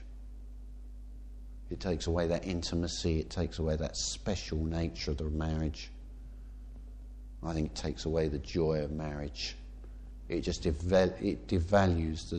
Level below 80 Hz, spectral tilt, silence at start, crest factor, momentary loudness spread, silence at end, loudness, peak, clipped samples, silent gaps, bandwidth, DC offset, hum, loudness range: -42 dBFS; -5.5 dB/octave; 0 s; 20 dB; 21 LU; 0 s; -33 LUFS; -14 dBFS; under 0.1%; none; 9.4 kHz; under 0.1%; none; 5 LU